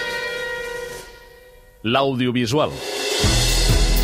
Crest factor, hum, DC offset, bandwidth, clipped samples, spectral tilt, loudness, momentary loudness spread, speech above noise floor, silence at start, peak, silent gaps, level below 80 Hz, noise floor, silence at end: 16 dB; none; under 0.1%; 16 kHz; under 0.1%; -4 dB/octave; -20 LUFS; 13 LU; 27 dB; 0 s; -4 dBFS; none; -26 dBFS; -46 dBFS; 0 s